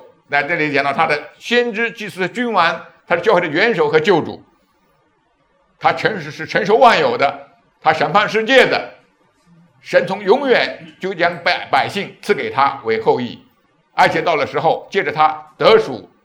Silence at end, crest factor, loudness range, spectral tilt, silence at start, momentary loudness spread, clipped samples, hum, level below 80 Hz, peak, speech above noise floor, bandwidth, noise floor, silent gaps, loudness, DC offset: 0.2 s; 16 dB; 3 LU; -5 dB/octave; 0.3 s; 10 LU; under 0.1%; none; -62 dBFS; 0 dBFS; 44 dB; 13 kHz; -60 dBFS; none; -16 LUFS; under 0.1%